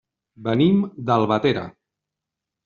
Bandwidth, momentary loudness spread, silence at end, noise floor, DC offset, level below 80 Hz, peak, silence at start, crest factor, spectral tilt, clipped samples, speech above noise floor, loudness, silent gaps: 7 kHz; 12 LU; 0.95 s; -85 dBFS; under 0.1%; -58 dBFS; -4 dBFS; 0.4 s; 18 dB; -6 dB/octave; under 0.1%; 66 dB; -20 LUFS; none